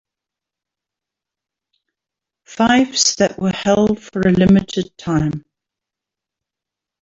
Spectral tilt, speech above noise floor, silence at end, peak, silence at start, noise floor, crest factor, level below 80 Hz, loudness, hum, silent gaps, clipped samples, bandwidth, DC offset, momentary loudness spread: -4.5 dB/octave; 70 dB; 1.6 s; -2 dBFS; 2.5 s; -85 dBFS; 18 dB; -46 dBFS; -16 LUFS; none; none; under 0.1%; 8 kHz; under 0.1%; 11 LU